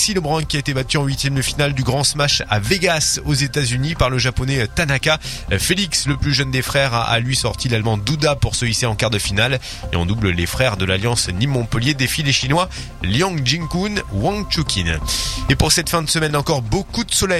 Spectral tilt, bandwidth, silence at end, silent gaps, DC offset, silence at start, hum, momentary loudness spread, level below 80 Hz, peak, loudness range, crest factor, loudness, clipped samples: -4 dB/octave; 16 kHz; 0 s; none; under 0.1%; 0 s; none; 4 LU; -32 dBFS; 0 dBFS; 1 LU; 18 dB; -18 LUFS; under 0.1%